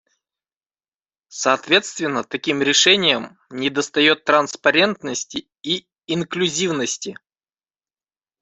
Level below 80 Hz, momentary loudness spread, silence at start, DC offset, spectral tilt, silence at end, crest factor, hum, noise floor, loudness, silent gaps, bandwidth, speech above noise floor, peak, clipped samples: -64 dBFS; 12 LU; 1.3 s; under 0.1%; -2.5 dB/octave; 1.3 s; 20 dB; none; under -90 dBFS; -18 LUFS; none; 8.2 kHz; over 70 dB; 0 dBFS; under 0.1%